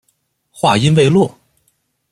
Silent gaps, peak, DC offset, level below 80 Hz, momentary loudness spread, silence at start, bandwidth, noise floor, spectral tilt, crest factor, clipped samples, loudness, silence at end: none; 0 dBFS; under 0.1%; -50 dBFS; 7 LU; 0.65 s; 12 kHz; -65 dBFS; -6 dB/octave; 16 dB; under 0.1%; -13 LUFS; 0.85 s